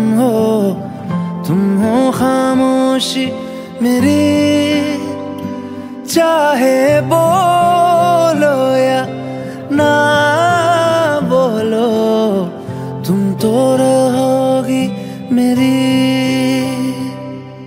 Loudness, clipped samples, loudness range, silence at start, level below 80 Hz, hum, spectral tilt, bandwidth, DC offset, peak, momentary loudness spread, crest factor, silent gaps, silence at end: -13 LUFS; under 0.1%; 3 LU; 0 s; -54 dBFS; none; -5.5 dB/octave; 16.5 kHz; under 0.1%; 0 dBFS; 12 LU; 12 dB; none; 0 s